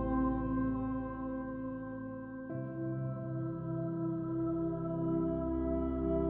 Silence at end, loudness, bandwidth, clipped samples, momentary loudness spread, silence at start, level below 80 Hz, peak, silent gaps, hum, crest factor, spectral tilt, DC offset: 0 s; -37 LUFS; 3.5 kHz; under 0.1%; 8 LU; 0 s; -48 dBFS; -22 dBFS; none; none; 14 dB; -10.5 dB/octave; under 0.1%